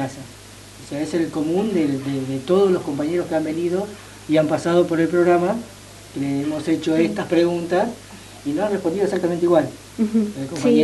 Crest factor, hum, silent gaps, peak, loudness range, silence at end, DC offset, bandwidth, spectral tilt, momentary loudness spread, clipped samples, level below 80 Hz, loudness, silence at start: 16 dB; none; none; -4 dBFS; 2 LU; 0 s; under 0.1%; 12 kHz; -6.5 dB/octave; 16 LU; under 0.1%; -54 dBFS; -21 LUFS; 0 s